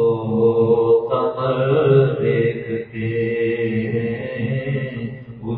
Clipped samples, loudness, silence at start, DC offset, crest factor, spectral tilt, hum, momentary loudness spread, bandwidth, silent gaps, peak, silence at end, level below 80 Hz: under 0.1%; -19 LUFS; 0 s; under 0.1%; 16 dB; -12 dB/octave; none; 11 LU; 4.3 kHz; none; -2 dBFS; 0 s; -52 dBFS